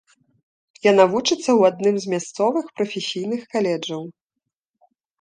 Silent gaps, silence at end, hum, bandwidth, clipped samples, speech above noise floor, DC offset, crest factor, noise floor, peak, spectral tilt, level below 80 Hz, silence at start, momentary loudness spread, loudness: none; 1.1 s; none; 9.8 kHz; under 0.1%; 62 dB; under 0.1%; 20 dB; -82 dBFS; -2 dBFS; -4.5 dB/octave; -68 dBFS; 0.85 s; 11 LU; -20 LUFS